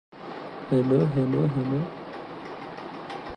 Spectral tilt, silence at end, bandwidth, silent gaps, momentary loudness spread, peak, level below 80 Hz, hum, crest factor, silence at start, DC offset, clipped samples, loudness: -9.5 dB/octave; 0 s; 9.2 kHz; none; 16 LU; -10 dBFS; -58 dBFS; none; 18 dB; 0.15 s; under 0.1%; under 0.1%; -25 LUFS